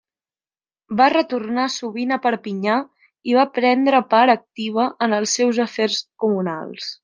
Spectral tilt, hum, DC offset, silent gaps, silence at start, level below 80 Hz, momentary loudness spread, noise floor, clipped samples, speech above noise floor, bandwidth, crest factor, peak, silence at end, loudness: -3.5 dB/octave; none; under 0.1%; none; 0.9 s; -72 dBFS; 10 LU; under -90 dBFS; under 0.1%; over 71 dB; 10 kHz; 18 dB; -2 dBFS; 0.1 s; -19 LUFS